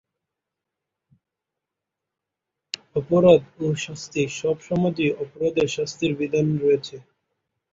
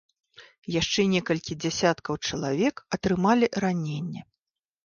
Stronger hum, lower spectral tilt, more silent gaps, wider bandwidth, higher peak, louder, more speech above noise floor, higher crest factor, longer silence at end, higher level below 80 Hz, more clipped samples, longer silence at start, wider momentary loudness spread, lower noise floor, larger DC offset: neither; about the same, -6 dB/octave vs -5 dB/octave; second, none vs 0.58-0.62 s; about the same, 7.8 kHz vs 7.4 kHz; first, -2 dBFS vs -10 dBFS; first, -22 LUFS vs -26 LUFS; first, 64 dB vs 59 dB; about the same, 22 dB vs 18 dB; first, 0.75 s vs 0.6 s; about the same, -58 dBFS vs -56 dBFS; neither; first, 2.95 s vs 0.4 s; about the same, 12 LU vs 10 LU; about the same, -85 dBFS vs -85 dBFS; neither